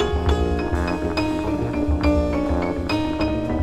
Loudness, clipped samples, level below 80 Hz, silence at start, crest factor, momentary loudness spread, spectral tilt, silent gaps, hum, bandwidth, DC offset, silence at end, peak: -22 LUFS; under 0.1%; -28 dBFS; 0 s; 14 dB; 3 LU; -7 dB/octave; none; none; 11.5 kHz; under 0.1%; 0 s; -6 dBFS